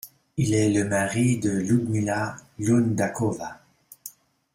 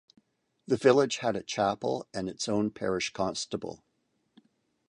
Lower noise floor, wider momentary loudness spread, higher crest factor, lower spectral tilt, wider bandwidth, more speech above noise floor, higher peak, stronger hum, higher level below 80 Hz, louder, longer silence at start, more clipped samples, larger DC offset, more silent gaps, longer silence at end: second, -46 dBFS vs -69 dBFS; first, 17 LU vs 12 LU; second, 16 dB vs 22 dB; first, -6 dB/octave vs -4.5 dB/octave; first, 16 kHz vs 10.5 kHz; second, 23 dB vs 40 dB; about the same, -10 dBFS vs -8 dBFS; neither; first, -56 dBFS vs -64 dBFS; first, -24 LUFS vs -29 LUFS; second, 0.05 s vs 0.7 s; neither; neither; neither; second, 0.45 s vs 1.15 s